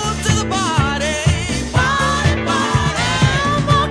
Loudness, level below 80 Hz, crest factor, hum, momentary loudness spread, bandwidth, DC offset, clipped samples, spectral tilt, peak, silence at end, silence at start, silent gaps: -16 LUFS; -28 dBFS; 16 dB; none; 2 LU; 11 kHz; under 0.1%; under 0.1%; -4.5 dB/octave; 0 dBFS; 0 s; 0 s; none